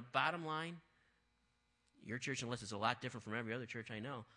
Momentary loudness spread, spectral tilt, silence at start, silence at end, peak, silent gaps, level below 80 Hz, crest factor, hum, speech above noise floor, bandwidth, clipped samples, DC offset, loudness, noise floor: 10 LU; -4 dB/octave; 0 s; 0.1 s; -20 dBFS; none; -80 dBFS; 26 dB; none; 37 dB; 10 kHz; under 0.1%; under 0.1%; -43 LUFS; -80 dBFS